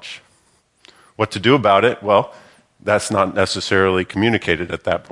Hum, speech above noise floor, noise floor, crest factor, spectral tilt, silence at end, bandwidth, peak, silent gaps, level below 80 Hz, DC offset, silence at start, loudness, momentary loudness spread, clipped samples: none; 42 dB; -59 dBFS; 18 dB; -5 dB/octave; 0.1 s; 11.5 kHz; 0 dBFS; none; -56 dBFS; under 0.1%; 0.05 s; -17 LUFS; 11 LU; under 0.1%